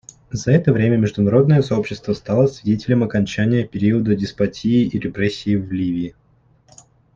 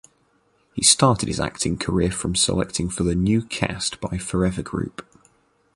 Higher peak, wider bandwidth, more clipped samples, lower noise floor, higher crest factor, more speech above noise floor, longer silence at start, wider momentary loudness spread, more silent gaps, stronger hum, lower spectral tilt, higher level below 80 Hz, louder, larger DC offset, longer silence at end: about the same, -2 dBFS vs 0 dBFS; second, 7.6 kHz vs 11.5 kHz; neither; second, -55 dBFS vs -63 dBFS; second, 16 dB vs 22 dB; about the same, 38 dB vs 41 dB; second, 0.3 s vs 0.75 s; second, 8 LU vs 12 LU; neither; neither; first, -7.5 dB/octave vs -4 dB/octave; second, -48 dBFS vs -40 dBFS; first, -18 LUFS vs -21 LUFS; neither; first, 1.05 s vs 0.75 s